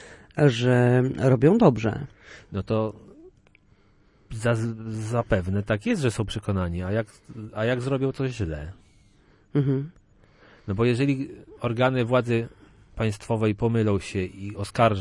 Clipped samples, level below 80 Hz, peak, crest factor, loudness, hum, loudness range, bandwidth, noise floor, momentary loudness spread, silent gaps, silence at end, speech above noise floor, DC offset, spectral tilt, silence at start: under 0.1%; -50 dBFS; -6 dBFS; 20 dB; -25 LUFS; none; 6 LU; 11.5 kHz; -59 dBFS; 16 LU; none; 0 s; 35 dB; under 0.1%; -7.5 dB/octave; 0 s